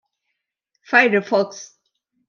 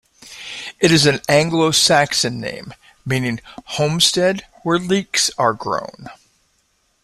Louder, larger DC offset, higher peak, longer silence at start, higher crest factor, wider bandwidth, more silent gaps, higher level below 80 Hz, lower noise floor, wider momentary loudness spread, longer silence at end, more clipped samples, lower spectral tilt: about the same, -17 LUFS vs -16 LUFS; neither; about the same, -2 dBFS vs -2 dBFS; first, 0.9 s vs 0.25 s; about the same, 20 dB vs 18 dB; second, 7.2 kHz vs 16 kHz; neither; second, -80 dBFS vs -52 dBFS; first, -78 dBFS vs -63 dBFS; second, 14 LU vs 17 LU; second, 0.65 s vs 0.9 s; neither; about the same, -4.5 dB/octave vs -3.5 dB/octave